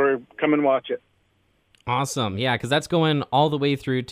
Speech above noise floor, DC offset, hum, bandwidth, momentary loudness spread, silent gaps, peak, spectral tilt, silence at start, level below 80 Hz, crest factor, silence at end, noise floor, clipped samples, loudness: 43 dB; under 0.1%; none; 15.5 kHz; 6 LU; none; -6 dBFS; -5.5 dB/octave; 0 s; -60 dBFS; 16 dB; 0 s; -65 dBFS; under 0.1%; -23 LUFS